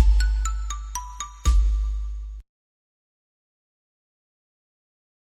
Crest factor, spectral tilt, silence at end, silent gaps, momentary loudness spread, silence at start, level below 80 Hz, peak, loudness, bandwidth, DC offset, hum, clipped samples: 20 dB; -3.5 dB/octave; 2.95 s; none; 15 LU; 0 s; -26 dBFS; -6 dBFS; -27 LUFS; 12 kHz; under 0.1%; none; under 0.1%